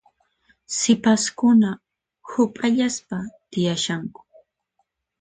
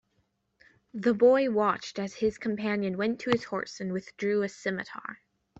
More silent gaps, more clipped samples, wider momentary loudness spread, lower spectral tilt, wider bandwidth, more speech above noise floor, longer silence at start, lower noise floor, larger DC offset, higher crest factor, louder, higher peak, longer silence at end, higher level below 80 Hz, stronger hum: neither; neither; about the same, 14 LU vs 13 LU; second, -4 dB/octave vs -6 dB/octave; first, 9.4 kHz vs 8 kHz; first, 52 dB vs 46 dB; second, 0.7 s vs 0.95 s; about the same, -73 dBFS vs -74 dBFS; neither; about the same, 18 dB vs 18 dB; first, -21 LUFS vs -28 LUFS; first, -6 dBFS vs -10 dBFS; first, 1.1 s vs 0.45 s; about the same, -62 dBFS vs -66 dBFS; neither